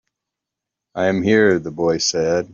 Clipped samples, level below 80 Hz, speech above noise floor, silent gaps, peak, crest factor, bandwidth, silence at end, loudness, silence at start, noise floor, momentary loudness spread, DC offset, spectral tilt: under 0.1%; -56 dBFS; 67 dB; none; -4 dBFS; 16 dB; 7.6 kHz; 0.1 s; -18 LUFS; 0.95 s; -84 dBFS; 7 LU; under 0.1%; -4 dB/octave